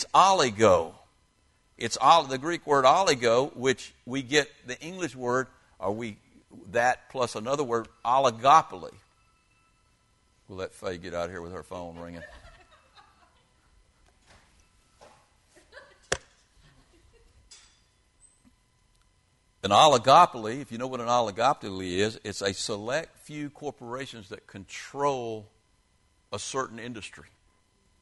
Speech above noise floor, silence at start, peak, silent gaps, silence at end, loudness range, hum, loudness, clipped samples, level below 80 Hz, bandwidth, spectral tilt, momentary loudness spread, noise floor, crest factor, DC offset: 41 dB; 0 s; -4 dBFS; none; 0.8 s; 19 LU; none; -25 LUFS; under 0.1%; -62 dBFS; 11.5 kHz; -3.5 dB/octave; 20 LU; -67 dBFS; 24 dB; under 0.1%